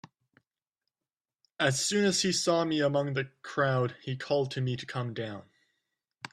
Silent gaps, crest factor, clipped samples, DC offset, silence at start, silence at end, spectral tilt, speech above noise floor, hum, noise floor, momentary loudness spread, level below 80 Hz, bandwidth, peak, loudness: none; 20 dB; under 0.1%; under 0.1%; 1.6 s; 0.05 s; -4 dB/octave; over 61 dB; none; under -90 dBFS; 12 LU; -70 dBFS; 13.5 kHz; -12 dBFS; -29 LUFS